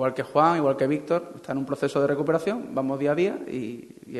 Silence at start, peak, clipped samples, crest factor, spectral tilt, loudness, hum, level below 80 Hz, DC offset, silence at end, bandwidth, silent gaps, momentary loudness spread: 0 s; -6 dBFS; under 0.1%; 18 dB; -7 dB/octave; -25 LUFS; none; -66 dBFS; under 0.1%; 0 s; 12.5 kHz; none; 11 LU